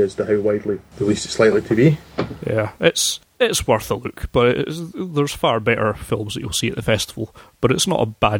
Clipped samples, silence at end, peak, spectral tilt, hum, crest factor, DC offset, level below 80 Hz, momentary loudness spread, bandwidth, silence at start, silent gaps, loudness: under 0.1%; 0 s; -2 dBFS; -4.5 dB/octave; none; 18 dB; under 0.1%; -42 dBFS; 10 LU; 18 kHz; 0 s; none; -20 LUFS